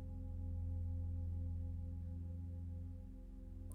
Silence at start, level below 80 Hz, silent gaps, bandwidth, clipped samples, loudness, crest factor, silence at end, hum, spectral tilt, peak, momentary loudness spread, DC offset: 0 s; -52 dBFS; none; 1.3 kHz; under 0.1%; -47 LUFS; 10 dB; 0 s; none; -10 dB/octave; -36 dBFS; 10 LU; under 0.1%